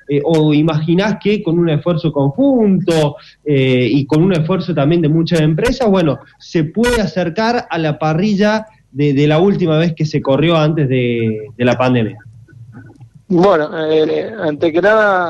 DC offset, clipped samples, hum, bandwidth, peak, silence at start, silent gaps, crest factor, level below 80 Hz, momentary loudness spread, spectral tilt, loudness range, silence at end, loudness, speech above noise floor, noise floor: under 0.1%; under 0.1%; none; 12 kHz; -2 dBFS; 0.1 s; none; 12 dB; -40 dBFS; 6 LU; -7 dB/octave; 2 LU; 0 s; -14 LUFS; 26 dB; -40 dBFS